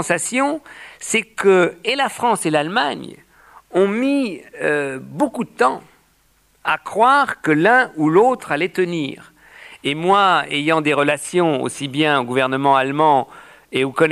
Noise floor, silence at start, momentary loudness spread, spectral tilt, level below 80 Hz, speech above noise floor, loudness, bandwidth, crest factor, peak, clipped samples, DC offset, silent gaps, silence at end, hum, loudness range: -58 dBFS; 0 s; 11 LU; -4.5 dB/octave; -64 dBFS; 41 dB; -18 LUFS; 15 kHz; 16 dB; -2 dBFS; under 0.1%; under 0.1%; none; 0 s; none; 4 LU